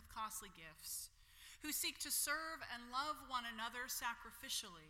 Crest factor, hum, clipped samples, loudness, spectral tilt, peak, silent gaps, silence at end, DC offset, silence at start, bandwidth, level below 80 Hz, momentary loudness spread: 20 dB; none; under 0.1%; -44 LUFS; 0 dB/octave; -28 dBFS; none; 0 s; under 0.1%; 0 s; 16.5 kHz; -70 dBFS; 13 LU